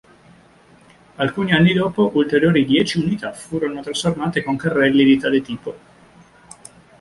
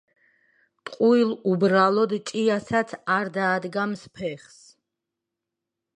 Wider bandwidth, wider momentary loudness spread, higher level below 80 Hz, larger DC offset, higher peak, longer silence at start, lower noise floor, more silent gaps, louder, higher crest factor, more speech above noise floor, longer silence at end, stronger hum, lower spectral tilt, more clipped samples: about the same, 11.5 kHz vs 10.5 kHz; second, 11 LU vs 14 LU; first, -52 dBFS vs -68 dBFS; neither; first, -2 dBFS vs -6 dBFS; first, 1.2 s vs 0.85 s; second, -50 dBFS vs -85 dBFS; neither; first, -18 LUFS vs -23 LUFS; about the same, 18 dB vs 20 dB; second, 32 dB vs 62 dB; second, 1.25 s vs 1.6 s; neither; about the same, -6 dB/octave vs -6 dB/octave; neither